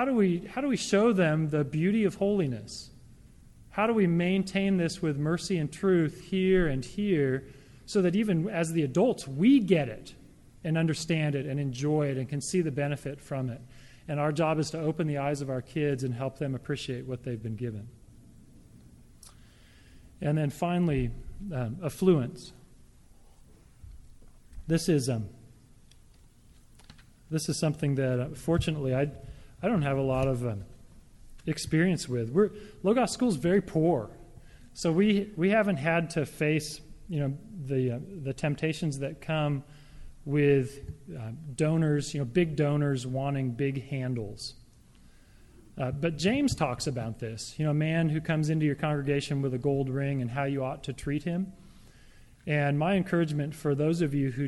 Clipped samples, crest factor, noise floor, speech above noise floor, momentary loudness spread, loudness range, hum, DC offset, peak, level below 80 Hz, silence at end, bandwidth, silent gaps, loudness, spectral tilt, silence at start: under 0.1%; 18 dB; -56 dBFS; 28 dB; 12 LU; 7 LU; none; under 0.1%; -10 dBFS; -52 dBFS; 0 s; 12.5 kHz; none; -29 LUFS; -6.5 dB/octave; 0 s